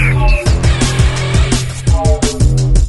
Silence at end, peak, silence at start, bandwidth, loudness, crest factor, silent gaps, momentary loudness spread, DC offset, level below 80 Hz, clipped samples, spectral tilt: 0 s; 0 dBFS; 0 s; 12 kHz; -13 LUFS; 10 dB; none; 3 LU; under 0.1%; -14 dBFS; under 0.1%; -5 dB/octave